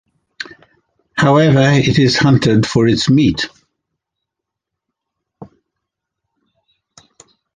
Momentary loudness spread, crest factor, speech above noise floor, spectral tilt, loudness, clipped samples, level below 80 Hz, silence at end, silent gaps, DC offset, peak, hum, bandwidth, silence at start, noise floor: 20 LU; 16 dB; 69 dB; -6 dB/octave; -12 LUFS; under 0.1%; -44 dBFS; 2.1 s; none; under 0.1%; 0 dBFS; none; 9.6 kHz; 0.4 s; -81 dBFS